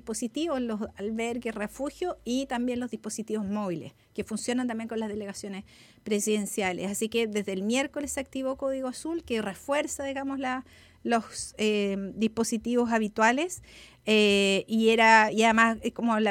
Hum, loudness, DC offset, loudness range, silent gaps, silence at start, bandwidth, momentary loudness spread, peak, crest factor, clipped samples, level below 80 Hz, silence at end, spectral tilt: none; -27 LUFS; under 0.1%; 9 LU; none; 0.05 s; 16.5 kHz; 13 LU; -6 dBFS; 22 dB; under 0.1%; -60 dBFS; 0 s; -3.5 dB/octave